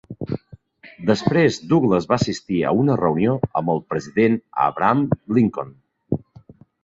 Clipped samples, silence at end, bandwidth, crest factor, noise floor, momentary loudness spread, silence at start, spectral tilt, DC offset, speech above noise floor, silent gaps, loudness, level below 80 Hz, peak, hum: under 0.1%; 0.65 s; 7.8 kHz; 18 dB; -47 dBFS; 11 LU; 0.1 s; -7 dB/octave; under 0.1%; 28 dB; none; -20 LUFS; -50 dBFS; -2 dBFS; none